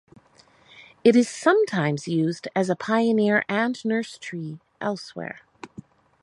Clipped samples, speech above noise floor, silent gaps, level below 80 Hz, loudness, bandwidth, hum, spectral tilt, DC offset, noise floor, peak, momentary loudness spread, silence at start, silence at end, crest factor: under 0.1%; 34 dB; none; -70 dBFS; -23 LUFS; 11.5 kHz; none; -6 dB/octave; under 0.1%; -57 dBFS; -4 dBFS; 17 LU; 0.8 s; 0.55 s; 20 dB